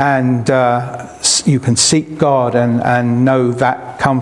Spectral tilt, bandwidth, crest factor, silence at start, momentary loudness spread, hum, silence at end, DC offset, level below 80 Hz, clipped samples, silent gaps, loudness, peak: -4.5 dB/octave; 12 kHz; 14 dB; 0 s; 5 LU; none; 0 s; under 0.1%; -50 dBFS; under 0.1%; none; -13 LUFS; 0 dBFS